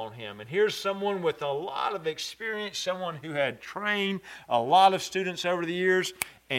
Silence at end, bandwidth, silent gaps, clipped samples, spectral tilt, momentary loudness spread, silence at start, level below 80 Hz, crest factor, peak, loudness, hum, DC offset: 0 s; 16 kHz; none; under 0.1%; -3.5 dB/octave; 10 LU; 0 s; -70 dBFS; 24 dB; -4 dBFS; -28 LUFS; none; under 0.1%